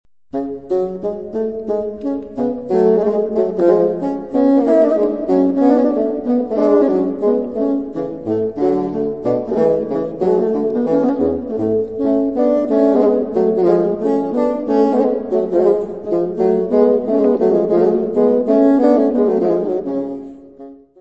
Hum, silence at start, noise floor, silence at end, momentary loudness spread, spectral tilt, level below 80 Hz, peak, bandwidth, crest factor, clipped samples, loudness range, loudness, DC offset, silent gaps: none; 0.35 s; -38 dBFS; 0.25 s; 9 LU; -9.5 dB/octave; -52 dBFS; 0 dBFS; 7.4 kHz; 14 dB; under 0.1%; 4 LU; -16 LUFS; 0.4%; none